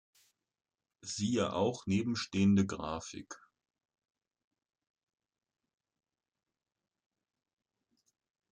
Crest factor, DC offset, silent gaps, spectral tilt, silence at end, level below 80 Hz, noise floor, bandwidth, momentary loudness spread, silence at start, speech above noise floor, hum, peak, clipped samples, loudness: 20 dB; under 0.1%; none; -5.5 dB/octave; 5.15 s; -70 dBFS; -80 dBFS; 9.6 kHz; 20 LU; 1.05 s; 47 dB; none; -18 dBFS; under 0.1%; -33 LUFS